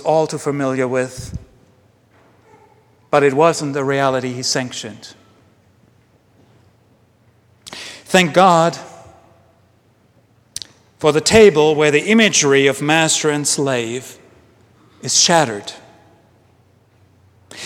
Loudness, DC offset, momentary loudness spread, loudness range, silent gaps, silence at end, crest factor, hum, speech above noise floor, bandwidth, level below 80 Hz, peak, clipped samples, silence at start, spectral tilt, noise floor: -15 LUFS; under 0.1%; 21 LU; 9 LU; none; 0 s; 18 dB; none; 40 dB; 16 kHz; -50 dBFS; 0 dBFS; under 0.1%; 0 s; -3.5 dB/octave; -55 dBFS